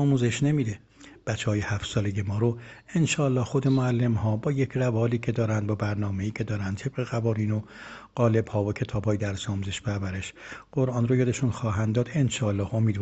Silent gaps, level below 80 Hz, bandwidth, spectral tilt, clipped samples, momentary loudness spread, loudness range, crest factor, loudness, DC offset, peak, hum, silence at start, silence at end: none; -54 dBFS; 8.4 kHz; -6.5 dB/octave; under 0.1%; 9 LU; 3 LU; 18 dB; -27 LUFS; under 0.1%; -8 dBFS; none; 0 s; 0 s